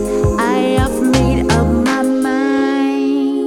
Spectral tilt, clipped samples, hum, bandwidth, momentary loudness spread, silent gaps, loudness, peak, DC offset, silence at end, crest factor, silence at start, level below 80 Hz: -6 dB/octave; under 0.1%; none; 16 kHz; 2 LU; none; -15 LUFS; 0 dBFS; under 0.1%; 0 s; 14 dB; 0 s; -26 dBFS